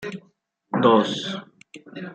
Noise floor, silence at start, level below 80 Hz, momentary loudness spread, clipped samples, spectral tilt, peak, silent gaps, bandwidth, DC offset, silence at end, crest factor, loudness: -62 dBFS; 0 s; -70 dBFS; 22 LU; under 0.1%; -5.5 dB/octave; -4 dBFS; none; 9 kHz; under 0.1%; 0 s; 20 dB; -21 LUFS